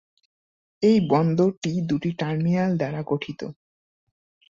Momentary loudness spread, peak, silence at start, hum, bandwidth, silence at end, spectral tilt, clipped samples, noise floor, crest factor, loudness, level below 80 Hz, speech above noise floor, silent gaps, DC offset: 9 LU; -8 dBFS; 0.8 s; none; 7.6 kHz; 1 s; -7.5 dB/octave; under 0.1%; under -90 dBFS; 16 dB; -23 LUFS; -60 dBFS; over 68 dB; 1.57-1.62 s; under 0.1%